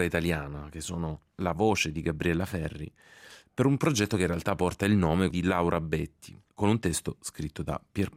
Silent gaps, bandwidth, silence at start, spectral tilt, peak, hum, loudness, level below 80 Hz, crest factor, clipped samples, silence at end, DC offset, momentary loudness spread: none; 16 kHz; 0 s; -5.5 dB/octave; -12 dBFS; none; -29 LUFS; -50 dBFS; 18 dB; under 0.1%; 0.05 s; under 0.1%; 12 LU